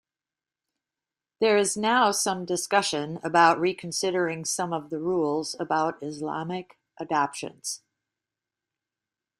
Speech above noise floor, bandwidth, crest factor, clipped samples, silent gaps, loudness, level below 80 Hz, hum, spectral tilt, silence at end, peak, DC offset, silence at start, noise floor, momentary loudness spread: over 64 dB; 15.5 kHz; 22 dB; under 0.1%; none; -26 LUFS; -72 dBFS; none; -3 dB/octave; 1.6 s; -6 dBFS; under 0.1%; 1.4 s; under -90 dBFS; 13 LU